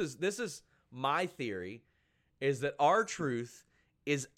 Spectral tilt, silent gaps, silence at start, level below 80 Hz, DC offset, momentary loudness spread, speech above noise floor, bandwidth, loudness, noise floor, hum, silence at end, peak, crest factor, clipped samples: -4.5 dB/octave; none; 0 s; -74 dBFS; under 0.1%; 19 LU; 41 dB; 15.5 kHz; -34 LUFS; -75 dBFS; none; 0.1 s; -16 dBFS; 20 dB; under 0.1%